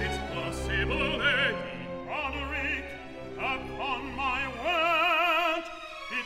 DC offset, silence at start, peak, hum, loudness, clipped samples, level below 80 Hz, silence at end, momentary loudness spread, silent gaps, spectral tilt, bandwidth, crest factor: under 0.1%; 0 s; -14 dBFS; none; -28 LUFS; under 0.1%; -44 dBFS; 0 s; 14 LU; none; -4.5 dB/octave; 16 kHz; 16 dB